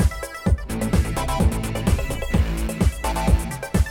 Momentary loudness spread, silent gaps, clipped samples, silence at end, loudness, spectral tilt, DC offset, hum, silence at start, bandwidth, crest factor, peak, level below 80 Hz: 3 LU; none; under 0.1%; 0 s; -23 LUFS; -6 dB/octave; under 0.1%; none; 0 s; 17 kHz; 16 dB; -6 dBFS; -24 dBFS